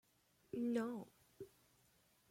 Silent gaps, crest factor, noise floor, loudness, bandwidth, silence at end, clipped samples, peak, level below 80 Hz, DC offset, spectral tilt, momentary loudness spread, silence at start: none; 18 dB; -76 dBFS; -44 LUFS; 16.5 kHz; 0.85 s; under 0.1%; -30 dBFS; -84 dBFS; under 0.1%; -6.5 dB/octave; 19 LU; 0.55 s